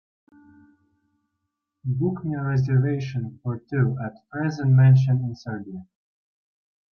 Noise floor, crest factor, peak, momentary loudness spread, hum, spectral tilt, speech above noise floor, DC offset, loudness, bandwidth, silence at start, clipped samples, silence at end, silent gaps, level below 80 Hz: -80 dBFS; 16 dB; -8 dBFS; 17 LU; none; -9.5 dB/octave; 58 dB; under 0.1%; -23 LUFS; 6.2 kHz; 1.85 s; under 0.1%; 1.1 s; none; -62 dBFS